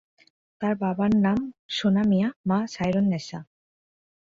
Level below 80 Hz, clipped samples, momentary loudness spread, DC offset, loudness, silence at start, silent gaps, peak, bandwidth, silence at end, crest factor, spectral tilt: -56 dBFS; under 0.1%; 9 LU; under 0.1%; -25 LUFS; 0.6 s; 1.59-1.69 s, 2.36-2.44 s; -12 dBFS; 7.6 kHz; 0.9 s; 14 dB; -7 dB/octave